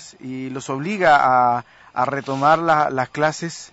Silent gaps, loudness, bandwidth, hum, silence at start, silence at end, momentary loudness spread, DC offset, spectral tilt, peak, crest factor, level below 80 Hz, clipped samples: none; -19 LUFS; 8 kHz; none; 0 s; 0.05 s; 15 LU; under 0.1%; -5 dB/octave; -4 dBFS; 14 dB; -58 dBFS; under 0.1%